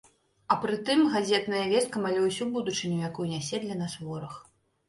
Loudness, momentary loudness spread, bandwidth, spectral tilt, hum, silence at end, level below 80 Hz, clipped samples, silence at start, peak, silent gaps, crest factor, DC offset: -28 LUFS; 13 LU; 11.5 kHz; -4.5 dB/octave; none; 0.45 s; -68 dBFS; under 0.1%; 0.5 s; -10 dBFS; none; 20 dB; under 0.1%